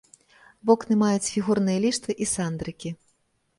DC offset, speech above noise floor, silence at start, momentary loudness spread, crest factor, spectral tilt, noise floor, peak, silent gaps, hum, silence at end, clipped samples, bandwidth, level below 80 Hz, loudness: under 0.1%; 46 dB; 0.65 s; 14 LU; 20 dB; -5 dB/octave; -69 dBFS; -6 dBFS; none; none; 0.65 s; under 0.1%; 11.5 kHz; -58 dBFS; -24 LUFS